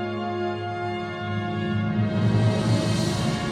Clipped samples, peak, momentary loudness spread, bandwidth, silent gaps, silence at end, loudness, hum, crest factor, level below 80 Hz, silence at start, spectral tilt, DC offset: under 0.1%; -8 dBFS; 7 LU; 12.5 kHz; none; 0 s; -25 LUFS; none; 16 dB; -48 dBFS; 0 s; -6.5 dB/octave; under 0.1%